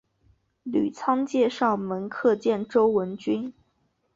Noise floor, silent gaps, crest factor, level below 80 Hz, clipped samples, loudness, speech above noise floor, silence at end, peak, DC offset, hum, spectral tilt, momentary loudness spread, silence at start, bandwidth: -71 dBFS; none; 18 dB; -66 dBFS; under 0.1%; -25 LUFS; 46 dB; 0.65 s; -8 dBFS; under 0.1%; none; -6.5 dB/octave; 8 LU; 0.65 s; 7.8 kHz